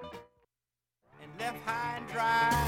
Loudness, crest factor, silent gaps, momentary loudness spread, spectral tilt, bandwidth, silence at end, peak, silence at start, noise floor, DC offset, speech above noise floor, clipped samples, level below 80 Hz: -32 LUFS; 18 dB; none; 22 LU; -4 dB/octave; 17 kHz; 0 s; -16 dBFS; 0 s; under -90 dBFS; under 0.1%; over 59 dB; under 0.1%; -52 dBFS